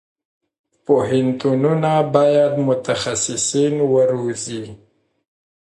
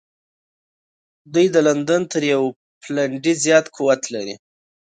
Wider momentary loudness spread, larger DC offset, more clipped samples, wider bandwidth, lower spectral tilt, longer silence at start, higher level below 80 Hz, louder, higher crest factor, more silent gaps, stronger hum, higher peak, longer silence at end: about the same, 11 LU vs 12 LU; neither; neither; first, 11.5 kHz vs 9.4 kHz; about the same, -5 dB/octave vs -4 dB/octave; second, 0.9 s vs 1.3 s; first, -58 dBFS vs -70 dBFS; about the same, -18 LUFS vs -19 LUFS; about the same, 18 dB vs 18 dB; second, none vs 2.56-2.81 s; neither; about the same, 0 dBFS vs -2 dBFS; first, 0.95 s vs 0.6 s